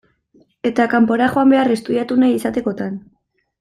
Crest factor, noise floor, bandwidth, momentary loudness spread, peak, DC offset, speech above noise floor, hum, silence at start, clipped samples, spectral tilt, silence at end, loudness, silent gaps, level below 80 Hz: 14 dB; -56 dBFS; 13 kHz; 11 LU; -2 dBFS; under 0.1%; 40 dB; none; 0.65 s; under 0.1%; -6 dB/octave; 0.6 s; -17 LUFS; none; -56 dBFS